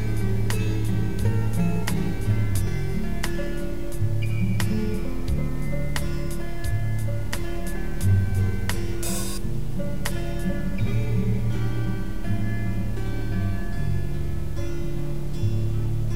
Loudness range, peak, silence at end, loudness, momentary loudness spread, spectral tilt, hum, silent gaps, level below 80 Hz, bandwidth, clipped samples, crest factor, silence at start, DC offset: 3 LU; -10 dBFS; 0 s; -27 LUFS; 6 LU; -6.5 dB/octave; none; none; -32 dBFS; 16 kHz; under 0.1%; 16 dB; 0 s; 5%